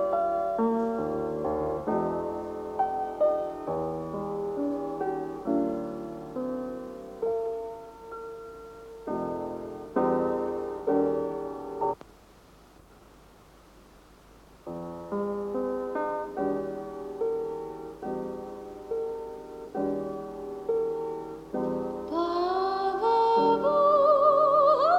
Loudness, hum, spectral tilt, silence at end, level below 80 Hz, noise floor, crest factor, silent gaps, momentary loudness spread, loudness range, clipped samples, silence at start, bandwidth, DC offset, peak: -29 LUFS; none; -7.5 dB/octave; 0 s; -58 dBFS; -54 dBFS; 18 dB; none; 17 LU; 9 LU; under 0.1%; 0 s; 14.5 kHz; under 0.1%; -10 dBFS